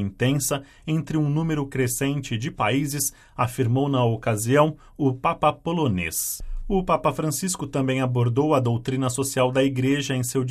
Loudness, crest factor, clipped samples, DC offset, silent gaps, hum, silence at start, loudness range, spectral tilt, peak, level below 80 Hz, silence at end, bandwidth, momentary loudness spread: -23 LUFS; 18 dB; under 0.1%; under 0.1%; none; none; 0 s; 2 LU; -5.5 dB/octave; -6 dBFS; -42 dBFS; 0 s; 15.5 kHz; 6 LU